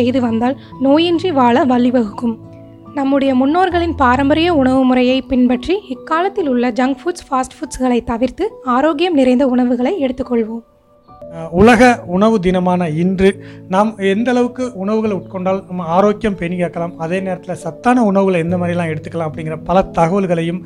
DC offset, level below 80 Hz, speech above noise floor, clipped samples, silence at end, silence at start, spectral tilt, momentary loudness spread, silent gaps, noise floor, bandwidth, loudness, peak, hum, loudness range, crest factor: under 0.1%; -40 dBFS; 29 dB; under 0.1%; 0 s; 0 s; -6.5 dB/octave; 9 LU; none; -44 dBFS; 11.5 kHz; -15 LUFS; 0 dBFS; none; 4 LU; 14 dB